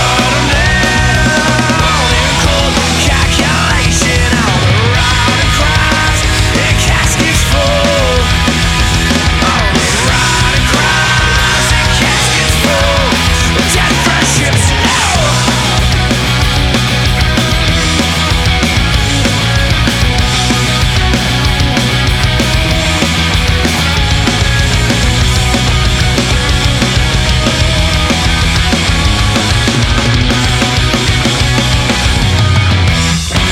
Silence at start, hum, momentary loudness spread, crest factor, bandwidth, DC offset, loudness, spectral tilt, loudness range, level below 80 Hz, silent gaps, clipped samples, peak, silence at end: 0 s; none; 2 LU; 10 dB; 16.5 kHz; under 0.1%; -10 LUFS; -3.5 dB/octave; 1 LU; -16 dBFS; none; under 0.1%; 0 dBFS; 0 s